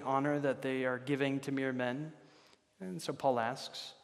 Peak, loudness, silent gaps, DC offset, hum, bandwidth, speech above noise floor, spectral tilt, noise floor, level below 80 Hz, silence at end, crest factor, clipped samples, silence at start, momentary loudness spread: -18 dBFS; -36 LUFS; none; under 0.1%; none; 13.5 kHz; 30 dB; -5.5 dB/octave; -65 dBFS; -84 dBFS; 0.1 s; 18 dB; under 0.1%; 0 s; 10 LU